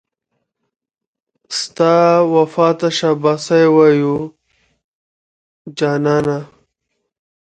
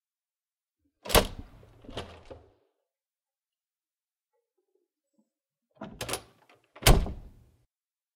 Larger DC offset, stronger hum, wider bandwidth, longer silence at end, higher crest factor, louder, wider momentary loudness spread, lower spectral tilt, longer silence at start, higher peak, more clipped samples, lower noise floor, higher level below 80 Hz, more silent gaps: neither; neither; second, 9.2 kHz vs 16 kHz; about the same, 0.95 s vs 0.95 s; second, 16 dB vs 28 dB; first, -14 LUFS vs -27 LUFS; second, 12 LU vs 24 LU; first, -5.5 dB/octave vs -3.5 dB/octave; first, 1.5 s vs 1.05 s; first, 0 dBFS vs -6 dBFS; neither; second, -73 dBFS vs under -90 dBFS; second, -58 dBFS vs -36 dBFS; first, 4.84-5.65 s vs none